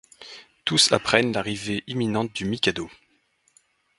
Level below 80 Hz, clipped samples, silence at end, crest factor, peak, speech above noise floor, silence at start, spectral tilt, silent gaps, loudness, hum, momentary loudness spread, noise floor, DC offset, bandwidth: -56 dBFS; under 0.1%; 1.1 s; 26 dB; 0 dBFS; 43 dB; 0.2 s; -3 dB/octave; none; -23 LUFS; none; 22 LU; -66 dBFS; under 0.1%; 11.5 kHz